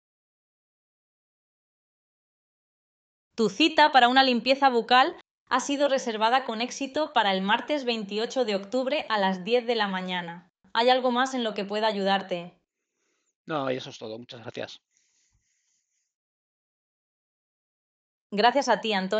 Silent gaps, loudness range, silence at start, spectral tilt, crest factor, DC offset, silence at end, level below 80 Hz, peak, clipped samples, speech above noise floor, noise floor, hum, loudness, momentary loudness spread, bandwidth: 5.31-5.46 s, 13.35-13.44 s, 16.14-18.30 s; 15 LU; 3.35 s; -4 dB/octave; 20 dB; under 0.1%; 0 s; -76 dBFS; -8 dBFS; under 0.1%; 53 dB; -78 dBFS; none; -25 LUFS; 15 LU; 9 kHz